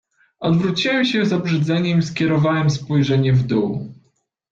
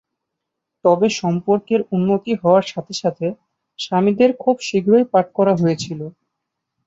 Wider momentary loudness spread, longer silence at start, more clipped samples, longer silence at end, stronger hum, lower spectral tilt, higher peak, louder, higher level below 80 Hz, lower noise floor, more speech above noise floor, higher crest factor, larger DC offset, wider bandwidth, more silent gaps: second, 5 LU vs 11 LU; second, 0.4 s vs 0.85 s; neither; second, 0.6 s vs 0.75 s; neither; about the same, -6.5 dB/octave vs -6.5 dB/octave; second, -6 dBFS vs -2 dBFS; about the same, -18 LUFS vs -18 LUFS; first, -52 dBFS vs -62 dBFS; second, -64 dBFS vs -80 dBFS; second, 47 dB vs 62 dB; about the same, 12 dB vs 16 dB; neither; about the same, 7.6 kHz vs 8 kHz; neither